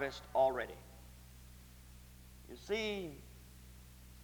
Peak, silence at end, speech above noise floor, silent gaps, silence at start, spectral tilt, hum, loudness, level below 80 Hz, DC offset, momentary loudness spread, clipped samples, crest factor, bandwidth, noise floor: -20 dBFS; 0 s; 19 dB; none; 0 s; -4.5 dB/octave; none; -38 LUFS; -58 dBFS; under 0.1%; 24 LU; under 0.1%; 20 dB; over 20 kHz; -57 dBFS